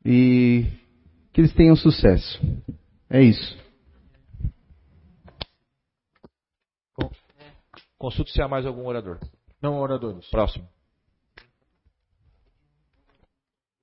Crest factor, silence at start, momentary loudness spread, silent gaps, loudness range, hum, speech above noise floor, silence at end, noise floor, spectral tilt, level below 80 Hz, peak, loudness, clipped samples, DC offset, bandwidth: 22 dB; 0.05 s; 23 LU; none; 21 LU; none; 68 dB; 3.2 s; -88 dBFS; -12 dB/octave; -36 dBFS; -2 dBFS; -21 LUFS; under 0.1%; under 0.1%; 5.8 kHz